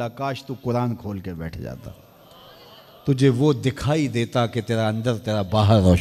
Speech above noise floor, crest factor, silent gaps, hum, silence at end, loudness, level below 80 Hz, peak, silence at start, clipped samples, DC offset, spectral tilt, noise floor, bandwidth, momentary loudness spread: 26 dB; 18 dB; none; none; 0 s; -22 LUFS; -44 dBFS; -4 dBFS; 0 s; under 0.1%; under 0.1%; -7 dB/octave; -48 dBFS; 14 kHz; 15 LU